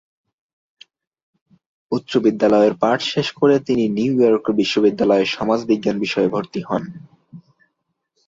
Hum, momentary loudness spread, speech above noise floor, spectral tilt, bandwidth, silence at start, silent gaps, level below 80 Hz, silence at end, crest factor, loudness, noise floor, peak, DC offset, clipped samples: none; 9 LU; 57 dB; -6 dB/octave; 7.8 kHz; 1.9 s; none; -58 dBFS; 0.9 s; 16 dB; -18 LUFS; -74 dBFS; -2 dBFS; under 0.1%; under 0.1%